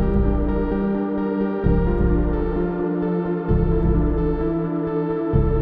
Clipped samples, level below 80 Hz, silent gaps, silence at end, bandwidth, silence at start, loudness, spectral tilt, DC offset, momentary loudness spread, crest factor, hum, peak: under 0.1%; -24 dBFS; none; 0 s; 4.7 kHz; 0 s; -22 LUFS; -12.5 dB/octave; under 0.1%; 3 LU; 14 dB; none; -6 dBFS